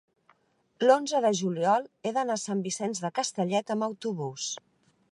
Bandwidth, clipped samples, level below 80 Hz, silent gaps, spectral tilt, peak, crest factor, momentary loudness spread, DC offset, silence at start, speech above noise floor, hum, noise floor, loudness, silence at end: 11.5 kHz; under 0.1%; -82 dBFS; none; -4 dB/octave; -8 dBFS; 20 dB; 10 LU; under 0.1%; 0.8 s; 41 dB; none; -69 dBFS; -28 LUFS; 0.55 s